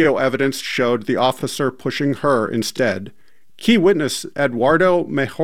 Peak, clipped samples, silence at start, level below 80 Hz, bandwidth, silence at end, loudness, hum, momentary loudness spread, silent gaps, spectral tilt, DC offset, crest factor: -2 dBFS; under 0.1%; 0 s; -54 dBFS; 16.5 kHz; 0 s; -18 LUFS; none; 7 LU; none; -5 dB/octave; 0.9%; 16 dB